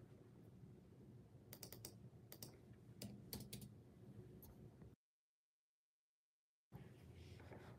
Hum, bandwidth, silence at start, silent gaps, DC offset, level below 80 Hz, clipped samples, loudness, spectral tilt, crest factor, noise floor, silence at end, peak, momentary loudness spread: 50 Hz at -80 dBFS; 16 kHz; 0 s; 4.95-6.71 s; under 0.1%; -76 dBFS; under 0.1%; -60 LUFS; -4.5 dB/octave; 30 dB; under -90 dBFS; 0 s; -30 dBFS; 10 LU